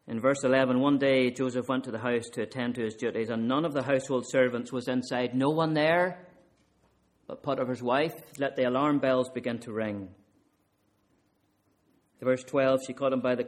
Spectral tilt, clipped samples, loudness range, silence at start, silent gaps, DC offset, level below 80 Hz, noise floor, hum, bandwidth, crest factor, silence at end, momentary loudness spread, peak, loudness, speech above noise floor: -6 dB/octave; under 0.1%; 5 LU; 0.05 s; none; under 0.1%; -70 dBFS; -71 dBFS; none; 14.5 kHz; 18 dB; 0 s; 9 LU; -10 dBFS; -28 LUFS; 43 dB